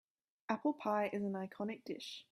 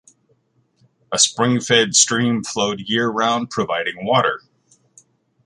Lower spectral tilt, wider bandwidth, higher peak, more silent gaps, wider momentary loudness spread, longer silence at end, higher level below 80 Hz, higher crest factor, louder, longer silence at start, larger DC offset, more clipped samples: first, -6 dB/octave vs -2.5 dB/octave; first, 14 kHz vs 11.5 kHz; second, -20 dBFS vs 0 dBFS; neither; about the same, 9 LU vs 8 LU; second, 0.1 s vs 1.1 s; second, -86 dBFS vs -60 dBFS; about the same, 20 dB vs 20 dB; second, -40 LUFS vs -17 LUFS; second, 0.5 s vs 1.1 s; neither; neither